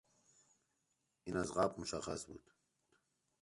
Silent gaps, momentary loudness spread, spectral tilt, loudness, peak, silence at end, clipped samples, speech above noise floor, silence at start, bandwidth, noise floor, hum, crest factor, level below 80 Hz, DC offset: none; 17 LU; -4.5 dB/octave; -41 LUFS; -20 dBFS; 1 s; under 0.1%; 44 dB; 1.25 s; 11.5 kHz; -84 dBFS; none; 24 dB; -68 dBFS; under 0.1%